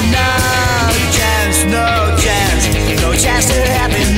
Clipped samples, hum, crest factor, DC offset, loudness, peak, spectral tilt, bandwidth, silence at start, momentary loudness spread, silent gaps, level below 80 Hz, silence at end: under 0.1%; none; 12 dB; under 0.1%; -12 LUFS; 0 dBFS; -3.5 dB/octave; 16.5 kHz; 0 s; 2 LU; none; -20 dBFS; 0 s